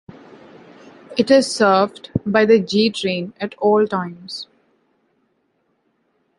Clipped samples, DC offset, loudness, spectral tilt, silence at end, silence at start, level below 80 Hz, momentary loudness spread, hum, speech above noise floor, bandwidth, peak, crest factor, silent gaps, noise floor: under 0.1%; under 0.1%; -17 LUFS; -5 dB/octave; 1.95 s; 1.1 s; -56 dBFS; 15 LU; none; 49 dB; 11.5 kHz; 0 dBFS; 20 dB; none; -67 dBFS